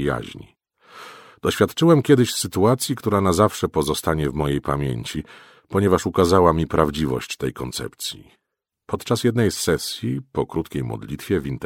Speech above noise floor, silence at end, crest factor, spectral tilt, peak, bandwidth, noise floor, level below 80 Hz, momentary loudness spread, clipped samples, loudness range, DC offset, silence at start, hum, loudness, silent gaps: 51 dB; 0 s; 22 dB; -5.5 dB/octave; 0 dBFS; 17 kHz; -72 dBFS; -42 dBFS; 14 LU; under 0.1%; 5 LU; under 0.1%; 0 s; none; -21 LUFS; none